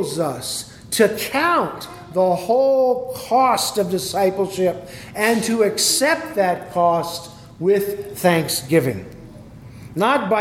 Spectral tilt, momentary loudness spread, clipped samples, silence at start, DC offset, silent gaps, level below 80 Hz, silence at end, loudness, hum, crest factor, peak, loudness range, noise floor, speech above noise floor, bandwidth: -3.5 dB/octave; 12 LU; under 0.1%; 0 s; under 0.1%; none; -54 dBFS; 0 s; -19 LUFS; none; 18 dB; -2 dBFS; 2 LU; -39 dBFS; 20 dB; 17.5 kHz